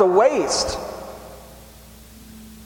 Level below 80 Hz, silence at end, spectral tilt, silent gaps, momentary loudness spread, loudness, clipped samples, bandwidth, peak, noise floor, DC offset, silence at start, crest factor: -46 dBFS; 0 s; -3.5 dB/octave; none; 27 LU; -20 LUFS; under 0.1%; 17.5 kHz; -2 dBFS; -44 dBFS; under 0.1%; 0 s; 20 dB